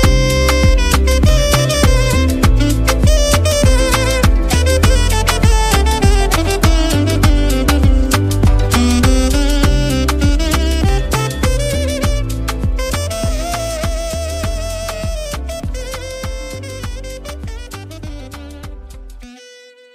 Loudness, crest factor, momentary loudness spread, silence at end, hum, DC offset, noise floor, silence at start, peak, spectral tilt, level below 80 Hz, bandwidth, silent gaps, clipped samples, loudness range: -14 LUFS; 12 dB; 15 LU; 0.6 s; none; under 0.1%; -41 dBFS; 0 s; 0 dBFS; -5 dB/octave; -16 dBFS; 16 kHz; none; under 0.1%; 13 LU